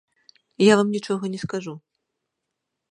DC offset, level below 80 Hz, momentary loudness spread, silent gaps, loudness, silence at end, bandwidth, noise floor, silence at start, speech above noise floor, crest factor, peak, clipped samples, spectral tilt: under 0.1%; -66 dBFS; 18 LU; none; -22 LUFS; 1.15 s; 10.5 kHz; -81 dBFS; 0.6 s; 60 dB; 22 dB; -2 dBFS; under 0.1%; -5.5 dB/octave